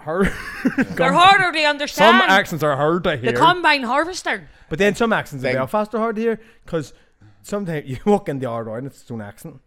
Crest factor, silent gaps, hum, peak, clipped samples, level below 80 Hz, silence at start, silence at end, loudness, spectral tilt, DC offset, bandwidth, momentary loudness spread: 18 dB; none; none; 0 dBFS; under 0.1%; -44 dBFS; 0 s; 0.1 s; -18 LUFS; -4.5 dB/octave; under 0.1%; 17 kHz; 17 LU